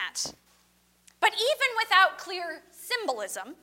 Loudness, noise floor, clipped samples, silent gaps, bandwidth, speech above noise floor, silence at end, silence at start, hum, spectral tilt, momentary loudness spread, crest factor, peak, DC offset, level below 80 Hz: -26 LUFS; -65 dBFS; under 0.1%; none; 16.5 kHz; 31 dB; 0.1 s; 0 s; 60 Hz at -70 dBFS; 0.5 dB/octave; 14 LU; 22 dB; -8 dBFS; under 0.1%; -74 dBFS